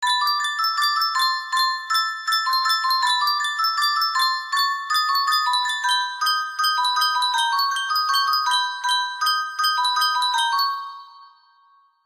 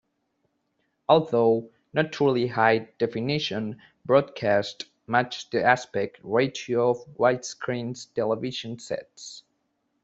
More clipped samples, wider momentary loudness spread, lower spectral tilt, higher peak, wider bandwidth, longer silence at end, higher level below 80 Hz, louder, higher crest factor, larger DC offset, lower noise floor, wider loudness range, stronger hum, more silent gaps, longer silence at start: neither; second, 3 LU vs 12 LU; second, 5.5 dB/octave vs -5 dB/octave; second, -8 dBFS vs -4 dBFS; first, 15.5 kHz vs 8 kHz; first, 0.8 s vs 0.65 s; second, -74 dBFS vs -66 dBFS; first, -20 LUFS vs -25 LUFS; second, 14 dB vs 22 dB; neither; second, -58 dBFS vs -74 dBFS; about the same, 1 LU vs 3 LU; neither; neither; second, 0 s vs 1.1 s